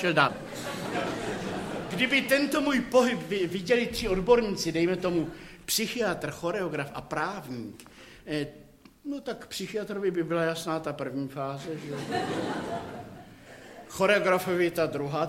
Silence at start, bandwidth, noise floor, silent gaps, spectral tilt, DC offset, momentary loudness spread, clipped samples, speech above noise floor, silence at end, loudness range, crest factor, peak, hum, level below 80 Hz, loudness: 0 s; 16.5 kHz; -48 dBFS; none; -4.5 dB/octave; under 0.1%; 17 LU; under 0.1%; 20 dB; 0 s; 9 LU; 22 dB; -6 dBFS; none; -54 dBFS; -28 LUFS